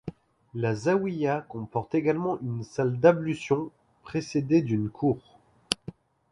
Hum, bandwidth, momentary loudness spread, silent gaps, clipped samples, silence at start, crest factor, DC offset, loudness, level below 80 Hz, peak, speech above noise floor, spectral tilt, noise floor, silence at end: none; 11.5 kHz; 12 LU; none; under 0.1%; 0.05 s; 24 dB; under 0.1%; -27 LUFS; -60 dBFS; -4 dBFS; 20 dB; -6.5 dB/octave; -46 dBFS; 0.4 s